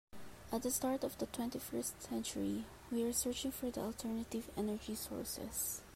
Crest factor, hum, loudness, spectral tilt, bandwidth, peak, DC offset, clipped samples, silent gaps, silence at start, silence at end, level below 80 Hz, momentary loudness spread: 18 dB; none; -40 LUFS; -3.5 dB/octave; 16 kHz; -22 dBFS; under 0.1%; under 0.1%; none; 0.1 s; 0 s; -62 dBFS; 6 LU